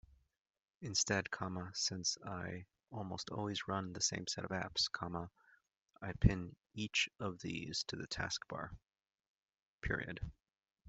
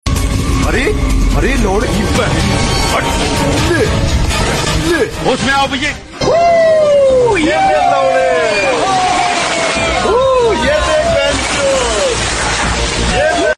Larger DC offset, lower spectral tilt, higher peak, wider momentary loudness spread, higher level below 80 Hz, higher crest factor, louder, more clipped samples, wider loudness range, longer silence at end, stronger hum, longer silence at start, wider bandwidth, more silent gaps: neither; about the same, -3 dB/octave vs -4 dB/octave; second, -14 dBFS vs -2 dBFS; first, 14 LU vs 5 LU; second, -54 dBFS vs -22 dBFS; first, 28 dB vs 10 dB; second, -40 LUFS vs -12 LUFS; neither; about the same, 4 LU vs 2 LU; about the same, 0 s vs 0.05 s; neither; first, 0.8 s vs 0.05 s; second, 8.2 kHz vs 14 kHz; first, 5.77-5.86 s, 9.27-9.49 s, 9.62-9.79 s vs none